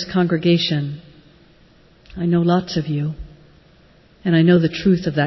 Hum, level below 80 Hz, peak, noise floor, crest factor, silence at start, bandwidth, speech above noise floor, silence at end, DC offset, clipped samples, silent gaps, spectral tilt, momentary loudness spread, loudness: none; -46 dBFS; -4 dBFS; -51 dBFS; 16 dB; 0 s; 6 kHz; 34 dB; 0 s; under 0.1%; under 0.1%; none; -7.5 dB/octave; 14 LU; -18 LUFS